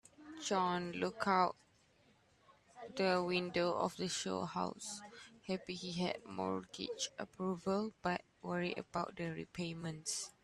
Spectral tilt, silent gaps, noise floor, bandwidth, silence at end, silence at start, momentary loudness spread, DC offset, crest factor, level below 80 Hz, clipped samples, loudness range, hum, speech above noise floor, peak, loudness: -4 dB/octave; none; -71 dBFS; 13 kHz; 0.15 s; 0.2 s; 11 LU; under 0.1%; 22 dB; -74 dBFS; under 0.1%; 4 LU; none; 32 dB; -18 dBFS; -39 LUFS